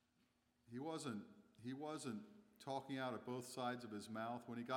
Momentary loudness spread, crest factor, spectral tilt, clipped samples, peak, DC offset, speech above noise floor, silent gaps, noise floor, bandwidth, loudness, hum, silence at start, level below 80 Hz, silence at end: 10 LU; 18 dB; -5 dB/octave; under 0.1%; -32 dBFS; under 0.1%; 33 dB; none; -81 dBFS; 18.5 kHz; -49 LUFS; none; 0.7 s; under -90 dBFS; 0 s